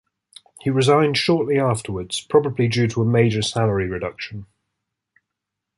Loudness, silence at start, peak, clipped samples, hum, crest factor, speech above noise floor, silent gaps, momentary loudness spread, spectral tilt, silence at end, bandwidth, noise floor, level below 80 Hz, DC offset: -20 LUFS; 0.65 s; -2 dBFS; under 0.1%; none; 18 dB; 63 dB; none; 11 LU; -5.5 dB/octave; 1.35 s; 11.5 kHz; -82 dBFS; -48 dBFS; under 0.1%